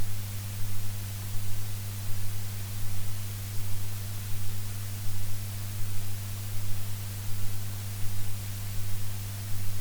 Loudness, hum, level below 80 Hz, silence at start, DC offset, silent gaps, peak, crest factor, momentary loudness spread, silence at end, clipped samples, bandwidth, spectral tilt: -36 LUFS; none; -40 dBFS; 0 s; under 0.1%; none; -14 dBFS; 12 dB; 0 LU; 0 s; under 0.1%; over 20 kHz; -4 dB/octave